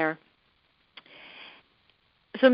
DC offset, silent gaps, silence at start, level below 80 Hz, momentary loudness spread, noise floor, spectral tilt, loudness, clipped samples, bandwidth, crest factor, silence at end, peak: under 0.1%; none; 0 s; -78 dBFS; 24 LU; -68 dBFS; -2 dB/octave; -30 LUFS; under 0.1%; 5.4 kHz; 24 dB; 0 s; -6 dBFS